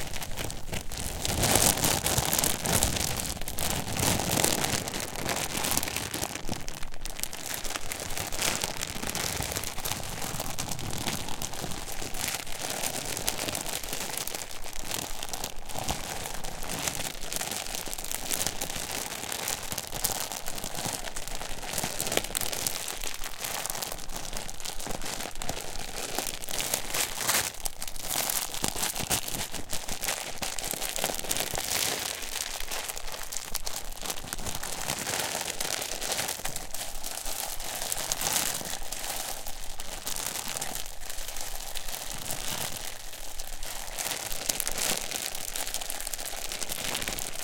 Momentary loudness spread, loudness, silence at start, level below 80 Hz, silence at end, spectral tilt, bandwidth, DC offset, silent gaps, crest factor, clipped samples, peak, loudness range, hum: 10 LU; -31 LUFS; 0 s; -42 dBFS; 0 s; -1.5 dB/octave; 17 kHz; under 0.1%; none; 28 dB; under 0.1%; -2 dBFS; 7 LU; none